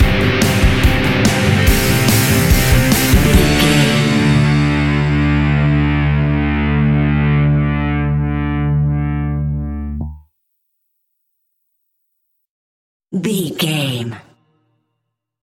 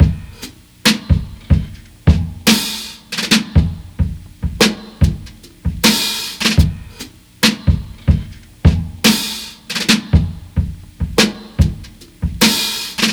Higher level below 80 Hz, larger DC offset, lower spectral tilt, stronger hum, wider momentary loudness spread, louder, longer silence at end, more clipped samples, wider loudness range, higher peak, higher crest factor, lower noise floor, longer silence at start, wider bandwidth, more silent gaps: about the same, -22 dBFS vs -24 dBFS; neither; first, -5.5 dB/octave vs -4 dB/octave; neither; second, 9 LU vs 13 LU; about the same, -14 LUFS vs -16 LUFS; first, 1.25 s vs 0 s; neither; first, 14 LU vs 1 LU; about the same, 0 dBFS vs 0 dBFS; about the same, 14 dB vs 16 dB; first, -74 dBFS vs -36 dBFS; about the same, 0 s vs 0 s; second, 17 kHz vs over 20 kHz; first, 12.49-13.00 s vs none